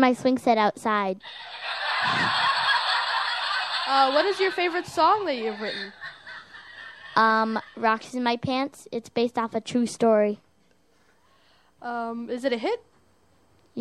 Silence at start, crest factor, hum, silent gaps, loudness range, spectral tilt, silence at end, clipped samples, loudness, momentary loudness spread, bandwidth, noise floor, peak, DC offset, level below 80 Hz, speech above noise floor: 0 s; 20 dB; none; none; 5 LU; -4 dB/octave; 0 s; under 0.1%; -24 LUFS; 17 LU; 13 kHz; -64 dBFS; -6 dBFS; under 0.1%; -70 dBFS; 40 dB